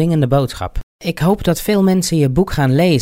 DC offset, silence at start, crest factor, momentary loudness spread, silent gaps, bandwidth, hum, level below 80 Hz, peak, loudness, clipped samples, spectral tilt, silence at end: under 0.1%; 0 s; 12 dB; 11 LU; 0.83-0.99 s; 16 kHz; none; -32 dBFS; -2 dBFS; -15 LUFS; under 0.1%; -6.5 dB/octave; 0 s